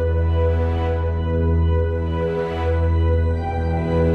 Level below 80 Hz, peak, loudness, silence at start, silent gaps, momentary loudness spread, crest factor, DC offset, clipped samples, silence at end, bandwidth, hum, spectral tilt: -24 dBFS; -8 dBFS; -21 LUFS; 0 s; none; 4 LU; 12 dB; under 0.1%; under 0.1%; 0 s; 4.3 kHz; none; -9.5 dB/octave